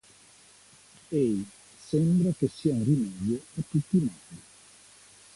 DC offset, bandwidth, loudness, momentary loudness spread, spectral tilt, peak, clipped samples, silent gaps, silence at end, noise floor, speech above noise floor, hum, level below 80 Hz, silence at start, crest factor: under 0.1%; 11.5 kHz; -28 LUFS; 21 LU; -8 dB/octave; -12 dBFS; under 0.1%; none; 0.95 s; -56 dBFS; 29 dB; 50 Hz at -50 dBFS; -60 dBFS; 1.1 s; 18 dB